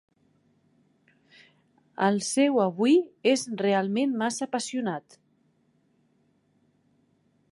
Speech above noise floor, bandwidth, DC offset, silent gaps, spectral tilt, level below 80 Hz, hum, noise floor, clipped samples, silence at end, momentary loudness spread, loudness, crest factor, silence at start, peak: 43 dB; 11.5 kHz; under 0.1%; none; -4.5 dB/octave; -82 dBFS; none; -68 dBFS; under 0.1%; 2.5 s; 8 LU; -26 LUFS; 20 dB; 2 s; -8 dBFS